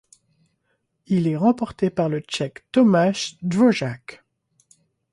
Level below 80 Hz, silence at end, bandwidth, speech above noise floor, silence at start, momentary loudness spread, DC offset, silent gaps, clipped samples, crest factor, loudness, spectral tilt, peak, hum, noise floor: -60 dBFS; 1 s; 11.5 kHz; 52 dB; 1.1 s; 11 LU; under 0.1%; none; under 0.1%; 16 dB; -21 LUFS; -6 dB/octave; -6 dBFS; none; -72 dBFS